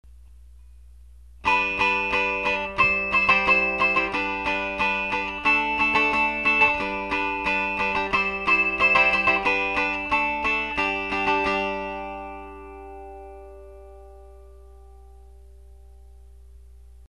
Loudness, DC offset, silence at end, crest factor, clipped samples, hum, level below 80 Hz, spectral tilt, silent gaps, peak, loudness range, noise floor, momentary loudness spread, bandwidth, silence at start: -21 LUFS; 0.2%; 0.1 s; 20 dB; under 0.1%; 60 Hz at -45 dBFS; -46 dBFS; -4 dB/octave; none; -4 dBFS; 8 LU; -47 dBFS; 17 LU; 12 kHz; 0.05 s